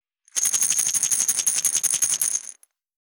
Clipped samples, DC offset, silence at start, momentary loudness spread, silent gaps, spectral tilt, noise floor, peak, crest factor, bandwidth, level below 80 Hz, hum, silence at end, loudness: under 0.1%; under 0.1%; 0.35 s; 7 LU; none; 2.5 dB/octave; -45 dBFS; -2 dBFS; 22 dB; over 20 kHz; under -90 dBFS; none; 0.55 s; -20 LUFS